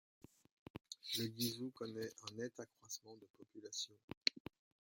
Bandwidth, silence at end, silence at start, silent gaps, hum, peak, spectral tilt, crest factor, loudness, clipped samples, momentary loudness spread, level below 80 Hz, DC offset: 16.5 kHz; 0.5 s; 0.75 s; 3.30-3.34 s, 4.04-4.08 s, 4.17-4.21 s; none; -14 dBFS; -3 dB/octave; 34 dB; -45 LUFS; under 0.1%; 19 LU; -80 dBFS; under 0.1%